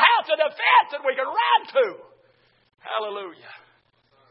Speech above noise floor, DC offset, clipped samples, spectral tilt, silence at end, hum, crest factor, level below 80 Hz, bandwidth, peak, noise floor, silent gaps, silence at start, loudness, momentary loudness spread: 38 dB; under 0.1%; under 0.1%; -5 dB/octave; 0.75 s; none; 22 dB; -86 dBFS; 5.6 kHz; 0 dBFS; -63 dBFS; none; 0 s; -21 LUFS; 16 LU